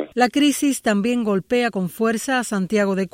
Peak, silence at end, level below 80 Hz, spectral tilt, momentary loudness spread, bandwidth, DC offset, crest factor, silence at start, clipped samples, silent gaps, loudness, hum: -4 dBFS; 0.05 s; -60 dBFS; -4.5 dB/octave; 4 LU; 16.5 kHz; under 0.1%; 16 dB; 0 s; under 0.1%; none; -20 LUFS; none